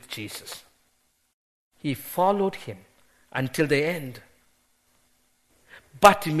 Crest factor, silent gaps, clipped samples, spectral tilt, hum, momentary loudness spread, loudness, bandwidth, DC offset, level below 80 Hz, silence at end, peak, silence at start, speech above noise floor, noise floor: 28 dB; 1.33-1.71 s; under 0.1%; -5 dB/octave; none; 23 LU; -24 LUFS; 13.5 kHz; under 0.1%; -58 dBFS; 0 s; 0 dBFS; 0.1 s; 45 dB; -69 dBFS